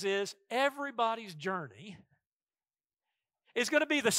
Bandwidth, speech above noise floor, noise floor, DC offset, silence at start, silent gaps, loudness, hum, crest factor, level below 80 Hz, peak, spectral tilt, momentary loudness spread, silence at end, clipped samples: 16 kHz; over 57 dB; under -90 dBFS; under 0.1%; 0 s; 2.27-2.40 s; -33 LUFS; none; 22 dB; -84 dBFS; -12 dBFS; -2.5 dB/octave; 15 LU; 0 s; under 0.1%